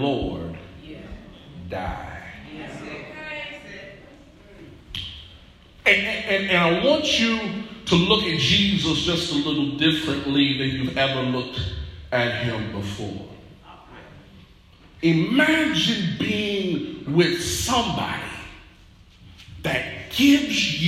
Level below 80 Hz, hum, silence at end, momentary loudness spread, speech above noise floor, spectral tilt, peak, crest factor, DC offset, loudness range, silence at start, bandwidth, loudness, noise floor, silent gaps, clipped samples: -46 dBFS; none; 0 s; 20 LU; 29 dB; -4.5 dB/octave; -4 dBFS; 20 dB; under 0.1%; 15 LU; 0 s; 15.5 kHz; -22 LUFS; -50 dBFS; none; under 0.1%